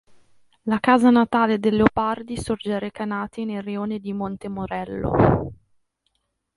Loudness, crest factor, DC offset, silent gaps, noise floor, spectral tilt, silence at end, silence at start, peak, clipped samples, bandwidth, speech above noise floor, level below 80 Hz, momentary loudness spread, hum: -22 LUFS; 22 dB; under 0.1%; none; -73 dBFS; -7 dB/octave; 1.05 s; 0.65 s; 0 dBFS; under 0.1%; 11.5 kHz; 52 dB; -44 dBFS; 12 LU; none